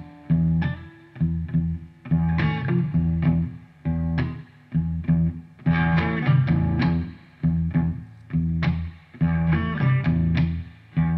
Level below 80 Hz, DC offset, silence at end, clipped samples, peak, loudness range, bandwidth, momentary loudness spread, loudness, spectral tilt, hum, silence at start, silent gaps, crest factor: -36 dBFS; under 0.1%; 0 s; under 0.1%; -8 dBFS; 2 LU; 5.2 kHz; 10 LU; -24 LUFS; -10 dB/octave; none; 0 s; none; 14 dB